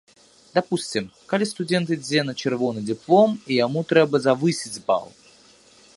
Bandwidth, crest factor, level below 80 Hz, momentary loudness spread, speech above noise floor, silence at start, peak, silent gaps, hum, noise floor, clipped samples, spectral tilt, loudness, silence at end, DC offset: 11.5 kHz; 20 dB; -66 dBFS; 8 LU; 31 dB; 0.55 s; -2 dBFS; none; none; -53 dBFS; under 0.1%; -5 dB/octave; -22 LUFS; 0.9 s; under 0.1%